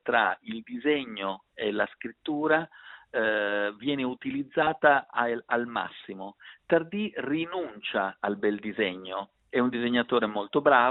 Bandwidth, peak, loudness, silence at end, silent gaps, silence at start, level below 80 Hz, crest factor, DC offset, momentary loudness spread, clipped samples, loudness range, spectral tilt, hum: 4.1 kHz; -6 dBFS; -28 LUFS; 0 s; none; 0.05 s; -70 dBFS; 22 dB; under 0.1%; 13 LU; under 0.1%; 3 LU; -9 dB/octave; none